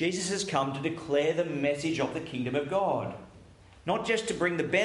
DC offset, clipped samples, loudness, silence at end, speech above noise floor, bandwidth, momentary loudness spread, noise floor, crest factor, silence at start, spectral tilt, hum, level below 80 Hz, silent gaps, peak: under 0.1%; under 0.1%; -30 LUFS; 0 s; 24 dB; 11.5 kHz; 6 LU; -53 dBFS; 18 dB; 0 s; -4.5 dB/octave; none; -62 dBFS; none; -12 dBFS